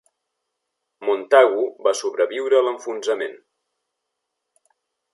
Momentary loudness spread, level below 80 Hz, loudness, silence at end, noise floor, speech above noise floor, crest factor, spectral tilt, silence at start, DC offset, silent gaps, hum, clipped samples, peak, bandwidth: 12 LU; -82 dBFS; -20 LUFS; 1.8 s; -79 dBFS; 60 dB; 20 dB; -1.5 dB/octave; 1 s; under 0.1%; none; none; under 0.1%; -2 dBFS; 11.5 kHz